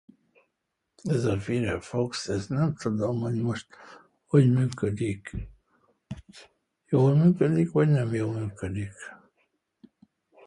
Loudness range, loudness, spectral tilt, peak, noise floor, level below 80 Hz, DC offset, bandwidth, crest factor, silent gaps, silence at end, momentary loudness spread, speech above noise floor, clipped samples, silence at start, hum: 3 LU; -26 LUFS; -7.5 dB/octave; -8 dBFS; -81 dBFS; -52 dBFS; under 0.1%; 11 kHz; 20 dB; none; 1.3 s; 21 LU; 56 dB; under 0.1%; 1.05 s; none